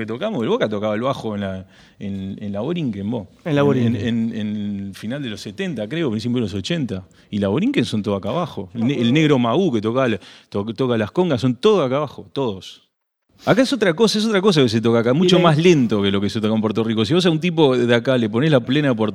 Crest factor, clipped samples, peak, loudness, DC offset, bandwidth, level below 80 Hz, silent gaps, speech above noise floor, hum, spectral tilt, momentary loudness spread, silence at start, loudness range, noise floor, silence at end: 18 dB; under 0.1%; 0 dBFS; -19 LUFS; under 0.1%; 13.5 kHz; -60 dBFS; none; 45 dB; none; -6.5 dB/octave; 12 LU; 0 s; 7 LU; -63 dBFS; 0 s